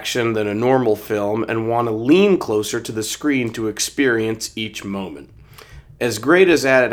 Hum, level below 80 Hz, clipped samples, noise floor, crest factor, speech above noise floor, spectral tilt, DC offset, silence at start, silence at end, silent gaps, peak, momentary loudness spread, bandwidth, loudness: none; -52 dBFS; under 0.1%; -42 dBFS; 18 dB; 24 dB; -4.5 dB/octave; under 0.1%; 0 s; 0 s; none; 0 dBFS; 12 LU; over 20 kHz; -18 LUFS